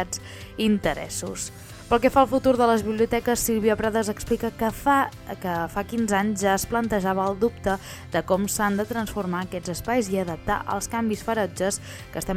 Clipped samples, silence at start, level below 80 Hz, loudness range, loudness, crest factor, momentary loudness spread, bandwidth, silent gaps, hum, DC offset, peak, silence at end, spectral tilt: under 0.1%; 0 s; -44 dBFS; 4 LU; -24 LUFS; 20 dB; 10 LU; 18.5 kHz; none; none; under 0.1%; -4 dBFS; 0 s; -4.5 dB/octave